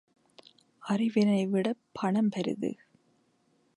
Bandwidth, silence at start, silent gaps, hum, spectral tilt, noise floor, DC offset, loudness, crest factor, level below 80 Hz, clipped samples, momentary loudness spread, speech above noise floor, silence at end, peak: 11 kHz; 0.85 s; none; none; -7 dB/octave; -70 dBFS; under 0.1%; -29 LUFS; 18 dB; -76 dBFS; under 0.1%; 10 LU; 42 dB; 1.05 s; -14 dBFS